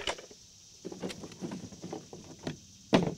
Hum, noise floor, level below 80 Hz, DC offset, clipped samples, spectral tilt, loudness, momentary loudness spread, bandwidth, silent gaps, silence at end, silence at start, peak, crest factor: none; -55 dBFS; -62 dBFS; under 0.1%; under 0.1%; -5 dB/octave; -39 LUFS; 17 LU; 16 kHz; none; 0 s; 0 s; -8 dBFS; 28 dB